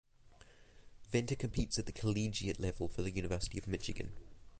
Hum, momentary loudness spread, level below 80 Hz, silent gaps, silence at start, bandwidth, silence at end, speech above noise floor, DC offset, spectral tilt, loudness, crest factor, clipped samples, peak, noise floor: none; 7 LU; -50 dBFS; none; 0.25 s; 9.6 kHz; 0 s; 24 dB; under 0.1%; -5 dB/octave; -39 LUFS; 20 dB; under 0.1%; -20 dBFS; -61 dBFS